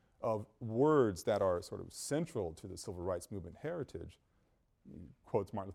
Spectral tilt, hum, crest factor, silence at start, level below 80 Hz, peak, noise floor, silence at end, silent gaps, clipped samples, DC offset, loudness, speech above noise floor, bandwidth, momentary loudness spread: -6 dB/octave; none; 18 dB; 0.2 s; -64 dBFS; -18 dBFS; -75 dBFS; 0 s; none; under 0.1%; under 0.1%; -37 LUFS; 38 dB; 15.5 kHz; 20 LU